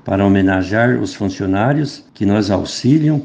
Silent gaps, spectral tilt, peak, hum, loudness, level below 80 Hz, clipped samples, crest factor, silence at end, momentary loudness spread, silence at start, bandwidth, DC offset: none; -6.5 dB/octave; 0 dBFS; none; -16 LUFS; -50 dBFS; under 0.1%; 14 dB; 0 s; 8 LU; 0.05 s; 9.4 kHz; under 0.1%